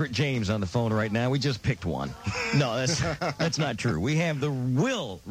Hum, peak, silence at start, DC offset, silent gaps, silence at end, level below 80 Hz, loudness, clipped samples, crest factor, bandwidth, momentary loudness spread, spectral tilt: none; -12 dBFS; 0 s; under 0.1%; none; 0 s; -52 dBFS; -27 LUFS; under 0.1%; 16 dB; 15.5 kHz; 5 LU; -5.5 dB/octave